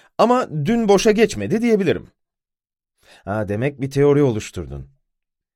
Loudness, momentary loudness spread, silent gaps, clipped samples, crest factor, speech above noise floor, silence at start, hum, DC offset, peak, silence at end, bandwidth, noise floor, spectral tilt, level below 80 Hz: -18 LUFS; 16 LU; none; under 0.1%; 18 dB; 68 dB; 0.2 s; none; under 0.1%; -2 dBFS; 0.7 s; 15.5 kHz; -86 dBFS; -6 dB/octave; -46 dBFS